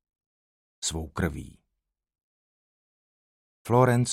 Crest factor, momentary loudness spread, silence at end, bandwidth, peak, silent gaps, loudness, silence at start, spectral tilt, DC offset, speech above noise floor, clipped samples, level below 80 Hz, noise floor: 22 dB; 18 LU; 0 s; 14.5 kHz; -8 dBFS; 2.23-3.65 s; -26 LUFS; 0.8 s; -5.5 dB/octave; under 0.1%; 59 dB; under 0.1%; -48 dBFS; -84 dBFS